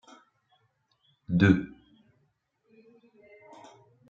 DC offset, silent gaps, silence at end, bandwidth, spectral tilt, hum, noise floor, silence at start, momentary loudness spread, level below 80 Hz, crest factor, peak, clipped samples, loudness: under 0.1%; none; 2.45 s; 7.4 kHz; -8 dB/octave; none; -74 dBFS; 1.3 s; 29 LU; -60 dBFS; 24 dB; -8 dBFS; under 0.1%; -25 LUFS